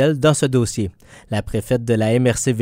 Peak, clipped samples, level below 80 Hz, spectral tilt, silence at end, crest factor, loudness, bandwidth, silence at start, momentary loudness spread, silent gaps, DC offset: -2 dBFS; under 0.1%; -42 dBFS; -5.5 dB/octave; 0 s; 16 dB; -19 LUFS; 16 kHz; 0 s; 10 LU; none; under 0.1%